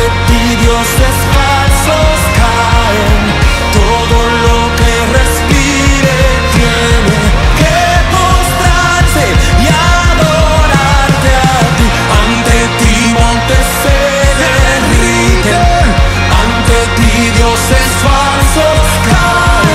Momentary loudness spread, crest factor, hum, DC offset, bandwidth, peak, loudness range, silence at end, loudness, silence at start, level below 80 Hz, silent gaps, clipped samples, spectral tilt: 1 LU; 8 dB; none; under 0.1%; 16 kHz; 0 dBFS; 1 LU; 0 s; -8 LUFS; 0 s; -12 dBFS; none; 0.7%; -4.5 dB/octave